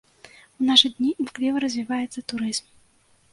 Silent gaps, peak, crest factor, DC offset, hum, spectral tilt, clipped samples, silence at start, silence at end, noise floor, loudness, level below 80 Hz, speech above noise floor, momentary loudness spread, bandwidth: none; -2 dBFS; 24 dB; under 0.1%; none; -2 dB/octave; under 0.1%; 0.6 s; 0.7 s; -60 dBFS; -22 LUFS; -66 dBFS; 38 dB; 12 LU; 11.5 kHz